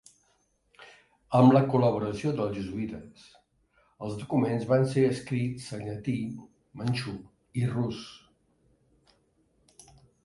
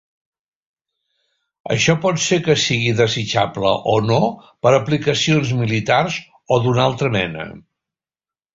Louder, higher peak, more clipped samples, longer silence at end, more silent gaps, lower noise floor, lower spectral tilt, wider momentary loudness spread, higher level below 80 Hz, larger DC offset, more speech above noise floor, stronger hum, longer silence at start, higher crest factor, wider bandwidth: second, -28 LUFS vs -17 LUFS; second, -8 dBFS vs 0 dBFS; neither; first, 2.1 s vs 0.95 s; neither; second, -70 dBFS vs under -90 dBFS; first, -7.5 dB/octave vs -4.5 dB/octave; first, 17 LU vs 8 LU; second, -60 dBFS vs -50 dBFS; neither; second, 43 dB vs over 73 dB; neither; second, 0.8 s vs 1.65 s; about the same, 22 dB vs 18 dB; first, 11.5 kHz vs 7.8 kHz